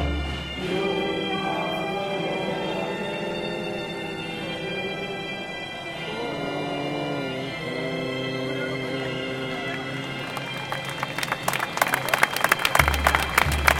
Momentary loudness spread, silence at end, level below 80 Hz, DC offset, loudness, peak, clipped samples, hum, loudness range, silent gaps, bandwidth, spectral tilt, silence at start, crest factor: 10 LU; 0 s; -38 dBFS; under 0.1%; -26 LUFS; -2 dBFS; under 0.1%; none; 7 LU; none; 17 kHz; -4 dB/octave; 0 s; 26 dB